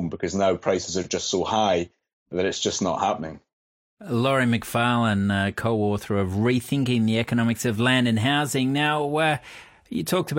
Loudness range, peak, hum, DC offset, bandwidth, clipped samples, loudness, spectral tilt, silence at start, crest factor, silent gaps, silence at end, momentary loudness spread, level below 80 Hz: 3 LU; -8 dBFS; none; under 0.1%; 16.5 kHz; under 0.1%; -23 LUFS; -5 dB/octave; 0 s; 16 dB; 2.13-2.26 s, 3.53-3.97 s; 0 s; 6 LU; -56 dBFS